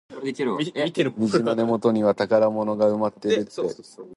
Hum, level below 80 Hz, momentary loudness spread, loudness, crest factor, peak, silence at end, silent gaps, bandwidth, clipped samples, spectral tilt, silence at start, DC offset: none; -66 dBFS; 9 LU; -23 LUFS; 16 dB; -6 dBFS; 0 s; none; 11.5 kHz; under 0.1%; -6 dB/octave; 0.1 s; under 0.1%